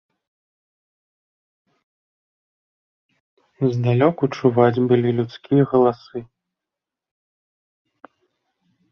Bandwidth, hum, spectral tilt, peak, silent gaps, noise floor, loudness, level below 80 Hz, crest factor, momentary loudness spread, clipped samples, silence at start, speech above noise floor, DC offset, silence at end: 6.6 kHz; none; -9 dB/octave; -2 dBFS; none; -87 dBFS; -19 LUFS; -62 dBFS; 20 dB; 10 LU; under 0.1%; 3.6 s; 69 dB; under 0.1%; 2.7 s